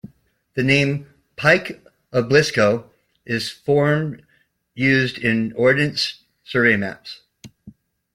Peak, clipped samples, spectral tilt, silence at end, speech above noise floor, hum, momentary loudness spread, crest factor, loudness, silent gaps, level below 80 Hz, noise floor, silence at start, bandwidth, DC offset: -2 dBFS; under 0.1%; -5.5 dB/octave; 0.45 s; 44 dB; none; 16 LU; 20 dB; -19 LUFS; none; -56 dBFS; -63 dBFS; 0.55 s; 16 kHz; under 0.1%